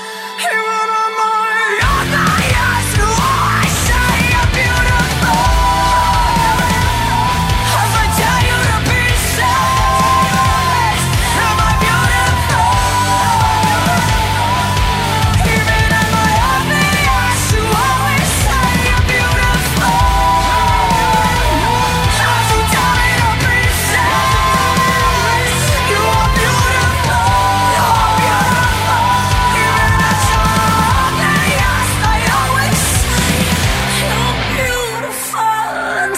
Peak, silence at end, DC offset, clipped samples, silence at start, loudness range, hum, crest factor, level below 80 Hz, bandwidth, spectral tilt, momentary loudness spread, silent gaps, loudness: -2 dBFS; 0 s; under 0.1%; under 0.1%; 0 s; 1 LU; none; 10 dB; -22 dBFS; 16.5 kHz; -3.5 dB/octave; 2 LU; none; -12 LUFS